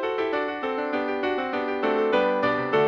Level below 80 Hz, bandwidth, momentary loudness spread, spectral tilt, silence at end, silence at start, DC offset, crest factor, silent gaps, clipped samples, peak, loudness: -62 dBFS; 6.8 kHz; 5 LU; -6.5 dB/octave; 0 s; 0 s; under 0.1%; 14 dB; none; under 0.1%; -10 dBFS; -25 LUFS